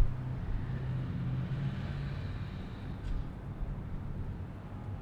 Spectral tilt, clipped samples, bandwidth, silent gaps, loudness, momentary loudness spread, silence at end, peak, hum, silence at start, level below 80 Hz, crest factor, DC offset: -8.5 dB/octave; under 0.1%; 6 kHz; none; -39 LUFS; 7 LU; 0 s; -16 dBFS; none; 0 s; -40 dBFS; 20 dB; under 0.1%